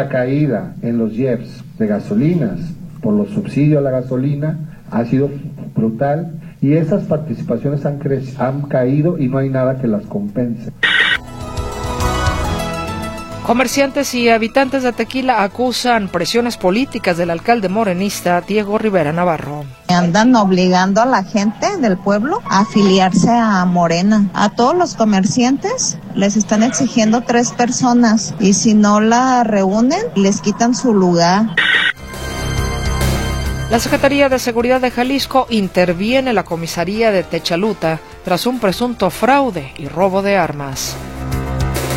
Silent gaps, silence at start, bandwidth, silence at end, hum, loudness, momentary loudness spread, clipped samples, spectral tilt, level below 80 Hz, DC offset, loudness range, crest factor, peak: none; 0 s; 16.5 kHz; 0 s; none; -15 LUFS; 9 LU; under 0.1%; -5 dB/octave; -34 dBFS; under 0.1%; 5 LU; 14 dB; 0 dBFS